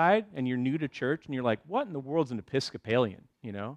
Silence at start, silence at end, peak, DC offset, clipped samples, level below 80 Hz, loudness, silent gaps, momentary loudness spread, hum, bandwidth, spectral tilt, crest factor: 0 s; 0 s; -12 dBFS; under 0.1%; under 0.1%; -70 dBFS; -31 LUFS; none; 5 LU; none; 10.5 kHz; -6.5 dB/octave; 18 dB